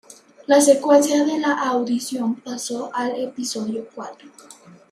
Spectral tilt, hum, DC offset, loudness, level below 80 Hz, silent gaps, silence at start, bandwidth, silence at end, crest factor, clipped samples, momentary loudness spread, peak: -3 dB/octave; none; under 0.1%; -20 LUFS; -74 dBFS; none; 0.1 s; 15.5 kHz; 0.4 s; 18 dB; under 0.1%; 16 LU; -2 dBFS